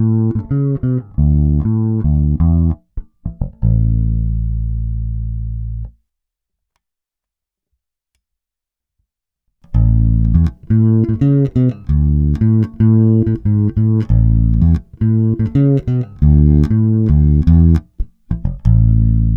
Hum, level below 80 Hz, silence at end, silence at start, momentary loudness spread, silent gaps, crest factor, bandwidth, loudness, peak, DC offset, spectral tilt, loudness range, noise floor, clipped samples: none; -20 dBFS; 0 s; 0 s; 12 LU; none; 14 dB; 2.9 kHz; -14 LUFS; 0 dBFS; under 0.1%; -12 dB/octave; 12 LU; -84 dBFS; under 0.1%